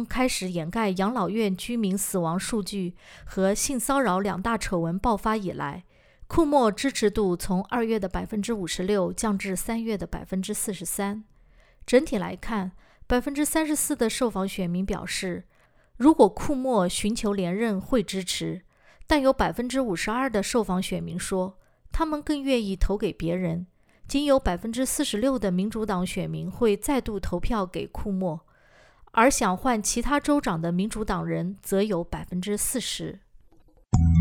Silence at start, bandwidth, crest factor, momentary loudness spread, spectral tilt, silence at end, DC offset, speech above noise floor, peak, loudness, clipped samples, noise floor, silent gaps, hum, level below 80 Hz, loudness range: 0 s; over 20 kHz; 20 dB; 9 LU; -5 dB/octave; 0 s; under 0.1%; 31 dB; -6 dBFS; -26 LUFS; under 0.1%; -56 dBFS; none; none; -40 dBFS; 4 LU